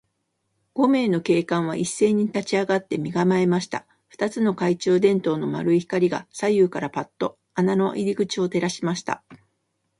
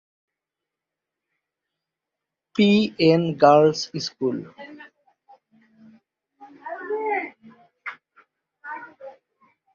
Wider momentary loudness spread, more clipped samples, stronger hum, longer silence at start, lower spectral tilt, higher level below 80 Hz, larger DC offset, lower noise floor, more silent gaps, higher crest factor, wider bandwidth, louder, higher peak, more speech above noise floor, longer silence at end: second, 9 LU vs 25 LU; neither; neither; second, 0.75 s vs 2.55 s; about the same, -6 dB/octave vs -6 dB/octave; about the same, -64 dBFS vs -68 dBFS; neither; second, -74 dBFS vs -86 dBFS; neither; second, 16 dB vs 22 dB; first, 11.5 kHz vs 7.4 kHz; second, -23 LUFS vs -20 LUFS; second, -6 dBFS vs -2 dBFS; second, 52 dB vs 68 dB; about the same, 0.65 s vs 0.65 s